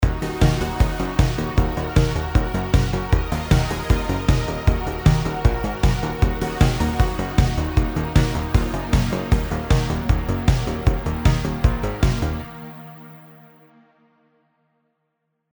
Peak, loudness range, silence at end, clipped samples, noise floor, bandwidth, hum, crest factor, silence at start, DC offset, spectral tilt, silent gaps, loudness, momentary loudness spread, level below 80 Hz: -2 dBFS; 4 LU; 2.3 s; under 0.1%; -74 dBFS; over 20 kHz; none; 18 dB; 0 s; under 0.1%; -6.5 dB/octave; none; -21 LUFS; 2 LU; -24 dBFS